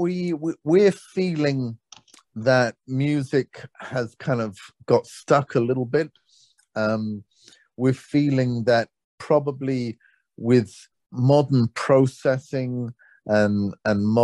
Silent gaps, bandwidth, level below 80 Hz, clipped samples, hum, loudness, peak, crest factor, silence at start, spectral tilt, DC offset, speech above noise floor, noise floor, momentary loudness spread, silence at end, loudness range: 9.04-9.18 s; 11.5 kHz; -64 dBFS; under 0.1%; none; -23 LUFS; -4 dBFS; 18 dB; 0 s; -7.5 dB/octave; under 0.1%; 38 dB; -60 dBFS; 14 LU; 0 s; 3 LU